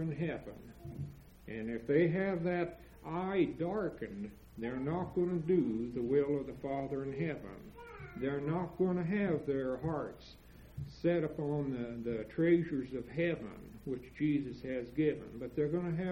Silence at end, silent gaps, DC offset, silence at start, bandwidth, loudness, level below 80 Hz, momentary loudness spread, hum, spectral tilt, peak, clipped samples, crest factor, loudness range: 0 s; none; under 0.1%; 0 s; 16 kHz; -36 LUFS; -60 dBFS; 16 LU; none; -9 dB/octave; -18 dBFS; under 0.1%; 18 dB; 2 LU